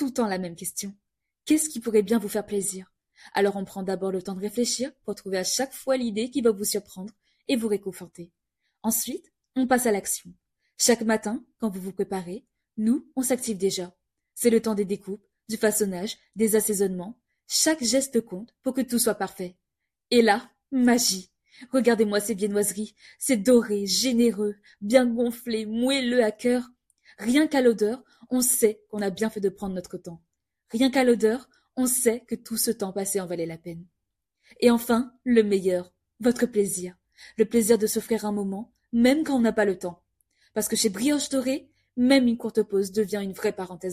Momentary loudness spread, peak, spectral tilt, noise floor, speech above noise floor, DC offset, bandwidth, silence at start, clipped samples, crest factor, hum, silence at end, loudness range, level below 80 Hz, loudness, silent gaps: 15 LU; -4 dBFS; -3.5 dB/octave; -81 dBFS; 57 dB; under 0.1%; 15.5 kHz; 0 s; under 0.1%; 22 dB; none; 0 s; 4 LU; -64 dBFS; -25 LUFS; none